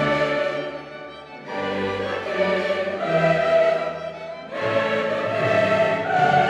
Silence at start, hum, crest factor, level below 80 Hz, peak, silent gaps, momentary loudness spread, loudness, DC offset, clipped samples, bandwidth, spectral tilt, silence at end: 0 s; none; 16 dB; -58 dBFS; -6 dBFS; none; 14 LU; -22 LUFS; under 0.1%; under 0.1%; 10 kHz; -6 dB/octave; 0 s